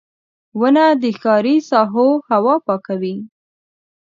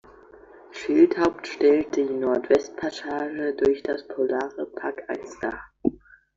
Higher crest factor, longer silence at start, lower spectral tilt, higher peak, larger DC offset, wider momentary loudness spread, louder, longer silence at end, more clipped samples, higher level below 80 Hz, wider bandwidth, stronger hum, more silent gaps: about the same, 16 dB vs 18 dB; second, 0.55 s vs 0.7 s; first, -7 dB/octave vs -5.5 dB/octave; first, 0 dBFS vs -6 dBFS; neither; second, 10 LU vs 13 LU; first, -15 LUFS vs -25 LUFS; first, 0.8 s vs 0.45 s; neither; second, -70 dBFS vs -58 dBFS; about the same, 7.4 kHz vs 7.6 kHz; neither; neither